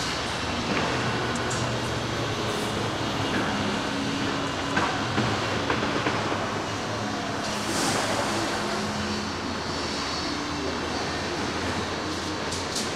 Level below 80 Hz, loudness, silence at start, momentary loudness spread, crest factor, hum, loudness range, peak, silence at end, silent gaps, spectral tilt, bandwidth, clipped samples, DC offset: -50 dBFS; -27 LUFS; 0 s; 4 LU; 18 dB; none; 2 LU; -10 dBFS; 0 s; none; -4 dB/octave; 16 kHz; under 0.1%; 0.1%